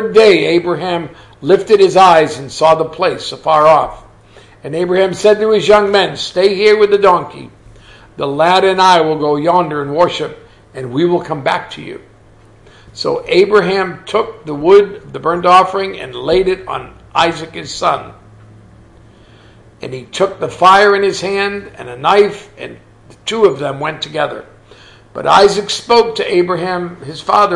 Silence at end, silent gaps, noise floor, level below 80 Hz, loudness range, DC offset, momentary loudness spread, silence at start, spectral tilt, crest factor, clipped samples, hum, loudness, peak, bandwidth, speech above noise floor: 0 s; none; -43 dBFS; -46 dBFS; 7 LU; under 0.1%; 16 LU; 0 s; -4.5 dB/octave; 14 dB; under 0.1%; none; -12 LUFS; 0 dBFS; 11.5 kHz; 31 dB